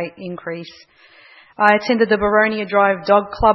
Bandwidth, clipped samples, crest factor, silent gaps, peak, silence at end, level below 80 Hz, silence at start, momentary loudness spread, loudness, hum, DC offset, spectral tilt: 6 kHz; under 0.1%; 18 dB; none; 0 dBFS; 0 s; -40 dBFS; 0 s; 15 LU; -16 LUFS; none; under 0.1%; -6.5 dB/octave